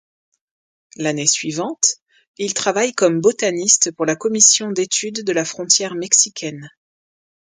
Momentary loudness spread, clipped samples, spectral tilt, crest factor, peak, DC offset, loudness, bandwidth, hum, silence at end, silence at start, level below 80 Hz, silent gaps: 12 LU; under 0.1%; -2 dB/octave; 20 dB; 0 dBFS; under 0.1%; -16 LUFS; 10.5 kHz; none; 0.9 s; 1 s; -68 dBFS; 2.02-2.06 s, 2.27-2.34 s